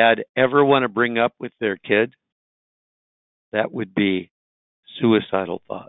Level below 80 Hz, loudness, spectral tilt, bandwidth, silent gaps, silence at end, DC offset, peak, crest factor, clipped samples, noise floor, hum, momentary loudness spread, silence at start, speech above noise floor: -62 dBFS; -21 LUFS; -10.5 dB/octave; 4.1 kHz; 0.29-0.34 s, 2.32-3.52 s, 4.31-4.83 s; 0.05 s; under 0.1%; -2 dBFS; 20 dB; under 0.1%; under -90 dBFS; none; 10 LU; 0 s; over 70 dB